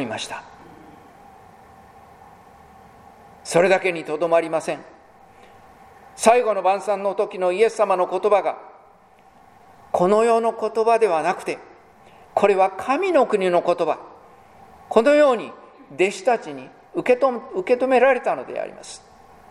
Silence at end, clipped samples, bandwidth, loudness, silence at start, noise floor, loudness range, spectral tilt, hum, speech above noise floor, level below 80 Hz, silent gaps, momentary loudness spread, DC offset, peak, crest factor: 0.55 s; under 0.1%; 13 kHz; -20 LUFS; 0 s; -52 dBFS; 3 LU; -4.5 dB/octave; none; 32 dB; -64 dBFS; none; 15 LU; under 0.1%; 0 dBFS; 22 dB